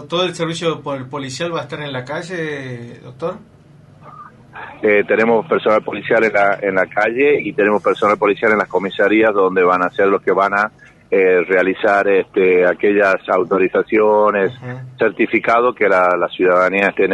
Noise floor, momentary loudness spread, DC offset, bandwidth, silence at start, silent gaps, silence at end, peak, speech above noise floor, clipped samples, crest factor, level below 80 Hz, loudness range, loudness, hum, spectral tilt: -44 dBFS; 12 LU; under 0.1%; 10.5 kHz; 0 s; none; 0 s; -2 dBFS; 28 dB; under 0.1%; 14 dB; -58 dBFS; 9 LU; -15 LUFS; none; -5.5 dB/octave